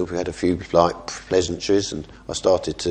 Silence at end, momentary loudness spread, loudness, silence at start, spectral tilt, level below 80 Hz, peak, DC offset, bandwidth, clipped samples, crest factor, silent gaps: 0 s; 11 LU; -22 LUFS; 0 s; -4.5 dB/octave; -44 dBFS; 0 dBFS; under 0.1%; 10.5 kHz; under 0.1%; 22 dB; none